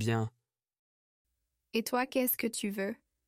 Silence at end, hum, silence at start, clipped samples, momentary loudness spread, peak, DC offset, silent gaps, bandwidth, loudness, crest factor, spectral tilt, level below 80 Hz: 0.35 s; none; 0 s; under 0.1%; 8 LU; -18 dBFS; under 0.1%; 0.79-1.25 s; 16 kHz; -33 LUFS; 18 dB; -5 dB/octave; -74 dBFS